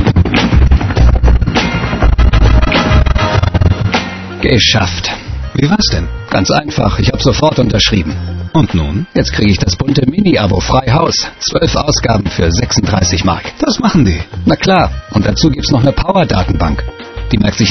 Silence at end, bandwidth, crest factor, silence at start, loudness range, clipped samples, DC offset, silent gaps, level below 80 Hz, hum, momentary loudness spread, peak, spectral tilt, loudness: 0 s; 6.4 kHz; 10 dB; 0 s; 1 LU; under 0.1%; 0.5%; none; -16 dBFS; none; 6 LU; 0 dBFS; -5 dB/octave; -12 LUFS